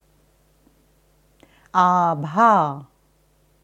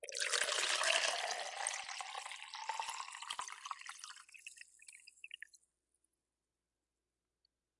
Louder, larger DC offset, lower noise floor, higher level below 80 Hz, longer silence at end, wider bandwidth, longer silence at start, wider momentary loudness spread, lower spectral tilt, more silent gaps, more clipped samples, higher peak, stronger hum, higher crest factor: first, -18 LUFS vs -38 LUFS; neither; second, -61 dBFS vs under -90 dBFS; first, -64 dBFS vs under -90 dBFS; second, 0.8 s vs 2.25 s; second, 9.4 kHz vs 11.5 kHz; first, 1.75 s vs 0 s; second, 10 LU vs 21 LU; first, -7 dB/octave vs 3.5 dB/octave; neither; neither; first, -4 dBFS vs -18 dBFS; neither; second, 20 dB vs 26 dB